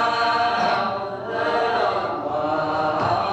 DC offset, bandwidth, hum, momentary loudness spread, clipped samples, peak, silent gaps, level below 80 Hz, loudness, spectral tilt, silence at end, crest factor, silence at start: under 0.1%; 8.8 kHz; none; 5 LU; under 0.1%; -10 dBFS; none; -58 dBFS; -22 LUFS; -5 dB/octave; 0 s; 12 dB; 0 s